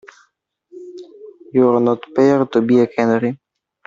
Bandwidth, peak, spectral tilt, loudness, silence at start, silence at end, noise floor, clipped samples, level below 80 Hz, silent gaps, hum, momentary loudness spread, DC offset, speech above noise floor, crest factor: 7.4 kHz; -2 dBFS; -8 dB/octave; -16 LUFS; 0.75 s; 0.5 s; -64 dBFS; under 0.1%; -62 dBFS; none; none; 22 LU; under 0.1%; 49 dB; 16 dB